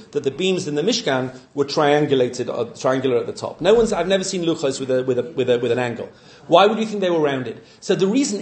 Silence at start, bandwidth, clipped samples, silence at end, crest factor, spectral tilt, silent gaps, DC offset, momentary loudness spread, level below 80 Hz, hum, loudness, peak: 0 s; 9 kHz; under 0.1%; 0 s; 20 dB; -4.5 dB/octave; none; under 0.1%; 9 LU; -54 dBFS; none; -20 LUFS; 0 dBFS